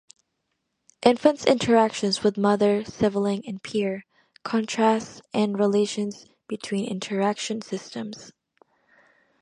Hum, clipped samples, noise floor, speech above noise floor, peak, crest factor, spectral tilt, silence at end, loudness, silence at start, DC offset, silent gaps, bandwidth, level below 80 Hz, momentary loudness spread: none; under 0.1%; -77 dBFS; 54 dB; -2 dBFS; 22 dB; -5 dB/octave; 1.1 s; -24 LUFS; 1 s; under 0.1%; none; 10.5 kHz; -64 dBFS; 15 LU